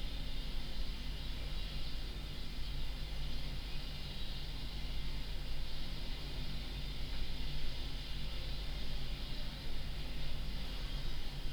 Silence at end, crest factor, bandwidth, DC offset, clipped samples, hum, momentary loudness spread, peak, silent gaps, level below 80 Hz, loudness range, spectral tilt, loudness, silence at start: 0 s; 12 dB; 17.5 kHz; under 0.1%; under 0.1%; none; 1 LU; -24 dBFS; none; -40 dBFS; 1 LU; -4.5 dB/octave; -45 LUFS; 0 s